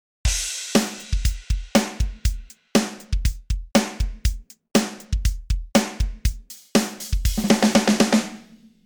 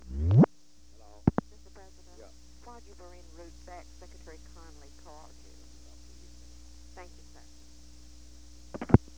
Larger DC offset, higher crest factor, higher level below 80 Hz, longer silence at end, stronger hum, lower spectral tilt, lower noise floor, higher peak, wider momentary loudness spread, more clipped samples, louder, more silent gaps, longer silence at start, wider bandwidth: second, under 0.1% vs 0.3%; second, 20 dB vs 32 dB; first, -28 dBFS vs -46 dBFS; about the same, 0.3 s vs 0.2 s; second, none vs 60 Hz at -55 dBFS; second, -4.5 dB/octave vs -8.5 dB/octave; second, -47 dBFS vs -60 dBFS; about the same, -2 dBFS vs 0 dBFS; second, 10 LU vs 28 LU; neither; first, -23 LUFS vs -27 LUFS; neither; first, 0.25 s vs 0.1 s; first, over 20 kHz vs 9.6 kHz